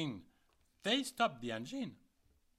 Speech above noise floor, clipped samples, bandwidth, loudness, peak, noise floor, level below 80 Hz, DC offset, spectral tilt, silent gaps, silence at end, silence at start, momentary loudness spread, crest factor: 35 dB; under 0.1%; 16 kHz; -38 LUFS; -20 dBFS; -74 dBFS; -74 dBFS; under 0.1%; -4 dB/octave; none; 0.65 s; 0 s; 11 LU; 22 dB